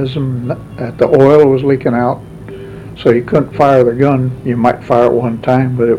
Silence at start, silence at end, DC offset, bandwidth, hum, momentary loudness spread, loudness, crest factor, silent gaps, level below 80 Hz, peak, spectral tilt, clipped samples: 0 s; 0 s; under 0.1%; 10 kHz; none; 16 LU; -12 LUFS; 12 dB; none; -42 dBFS; 0 dBFS; -9 dB/octave; 0.3%